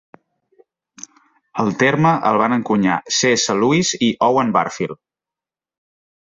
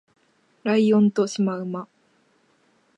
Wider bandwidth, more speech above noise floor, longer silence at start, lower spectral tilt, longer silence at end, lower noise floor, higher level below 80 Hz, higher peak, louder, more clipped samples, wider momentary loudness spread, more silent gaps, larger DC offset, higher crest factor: second, 8 kHz vs 9.4 kHz; first, 72 dB vs 43 dB; first, 1.55 s vs 0.65 s; second, -4 dB/octave vs -6.5 dB/octave; first, 1.4 s vs 1.15 s; first, -89 dBFS vs -63 dBFS; first, -58 dBFS vs -74 dBFS; first, -2 dBFS vs -8 dBFS; first, -17 LUFS vs -22 LUFS; neither; second, 12 LU vs 15 LU; neither; neither; about the same, 16 dB vs 16 dB